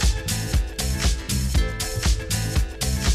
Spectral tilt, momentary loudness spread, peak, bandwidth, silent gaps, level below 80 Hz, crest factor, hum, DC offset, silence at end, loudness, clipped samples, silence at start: -3.5 dB/octave; 3 LU; -8 dBFS; 15.5 kHz; none; -24 dBFS; 14 dB; none; under 0.1%; 0 s; -24 LUFS; under 0.1%; 0 s